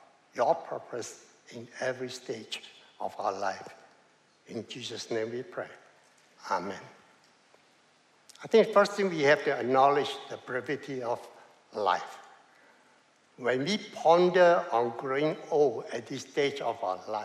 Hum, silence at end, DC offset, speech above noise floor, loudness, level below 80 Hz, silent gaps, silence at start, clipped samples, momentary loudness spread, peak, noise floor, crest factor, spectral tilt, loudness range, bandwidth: none; 0 s; under 0.1%; 35 dB; -29 LUFS; -84 dBFS; none; 0.35 s; under 0.1%; 19 LU; -10 dBFS; -64 dBFS; 22 dB; -4.5 dB/octave; 11 LU; 12.5 kHz